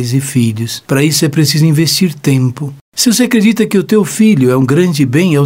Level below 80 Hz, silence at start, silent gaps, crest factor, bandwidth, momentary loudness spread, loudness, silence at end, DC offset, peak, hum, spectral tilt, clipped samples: -52 dBFS; 0 s; 2.81-2.92 s; 10 dB; 16.5 kHz; 6 LU; -11 LUFS; 0 s; 0.2%; 0 dBFS; none; -5 dB/octave; under 0.1%